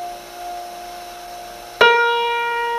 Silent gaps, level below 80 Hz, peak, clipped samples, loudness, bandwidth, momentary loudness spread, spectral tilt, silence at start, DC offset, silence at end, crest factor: none; -54 dBFS; 0 dBFS; under 0.1%; -16 LUFS; 15.5 kHz; 20 LU; -1 dB/octave; 0 s; under 0.1%; 0 s; 20 dB